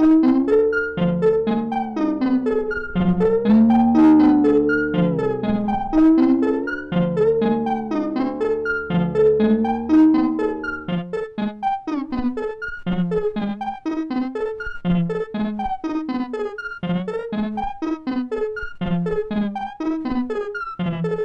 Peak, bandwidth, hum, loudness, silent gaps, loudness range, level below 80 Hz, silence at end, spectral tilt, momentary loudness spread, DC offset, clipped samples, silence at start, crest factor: -8 dBFS; 6 kHz; none; -20 LUFS; none; 8 LU; -42 dBFS; 0 s; -9 dB/octave; 12 LU; under 0.1%; under 0.1%; 0 s; 12 dB